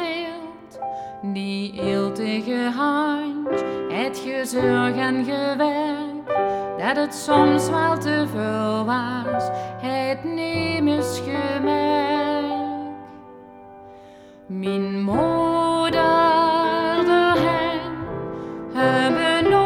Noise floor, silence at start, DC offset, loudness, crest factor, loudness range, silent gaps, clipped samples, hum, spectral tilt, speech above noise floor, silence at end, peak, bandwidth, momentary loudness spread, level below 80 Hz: -45 dBFS; 0 s; under 0.1%; -22 LUFS; 18 dB; 6 LU; none; under 0.1%; none; -5.5 dB/octave; 23 dB; 0 s; -4 dBFS; 17 kHz; 12 LU; -54 dBFS